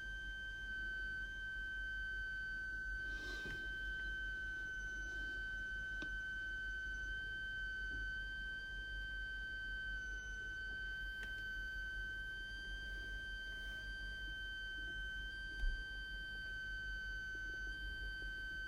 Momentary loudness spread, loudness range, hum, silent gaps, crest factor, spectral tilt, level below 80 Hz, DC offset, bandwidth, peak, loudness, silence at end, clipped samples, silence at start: 3 LU; 2 LU; 50 Hz at -55 dBFS; none; 16 dB; -3 dB/octave; -52 dBFS; under 0.1%; 14 kHz; -30 dBFS; -45 LUFS; 0 s; under 0.1%; 0 s